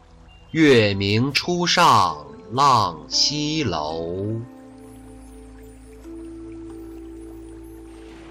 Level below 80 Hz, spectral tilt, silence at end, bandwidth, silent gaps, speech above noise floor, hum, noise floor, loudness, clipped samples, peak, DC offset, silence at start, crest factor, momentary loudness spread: -48 dBFS; -4 dB/octave; 0 s; 16 kHz; none; 28 dB; none; -47 dBFS; -19 LUFS; under 0.1%; -6 dBFS; under 0.1%; 0.55 s; 16 dB; 25 LU